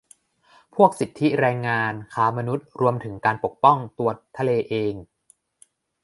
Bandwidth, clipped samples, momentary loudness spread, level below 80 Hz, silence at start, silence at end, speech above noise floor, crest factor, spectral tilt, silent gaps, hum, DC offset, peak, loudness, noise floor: 11.5 kHz; under 0.1%; 9 LU; -60 dBFS; 0.75 s; 1 s; 40 dB; 22 dB; -7 dB/octave; none; none; under 0.1%; -2 dBFS; -22 LUFS; -62 dBFS